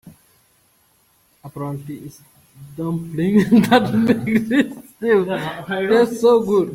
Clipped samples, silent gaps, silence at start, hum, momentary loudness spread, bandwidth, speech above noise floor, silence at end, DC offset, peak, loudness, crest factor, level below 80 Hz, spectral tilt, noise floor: under 0.1%; none; 0.05 s; none; 17 LU; 16.5 kHz; 42 dB; 0 s; under 0.1%; 0 dBFS; -18 LUFS; 18 dB; -56 dBFS; -6.5 dB/octave; -59 dBFS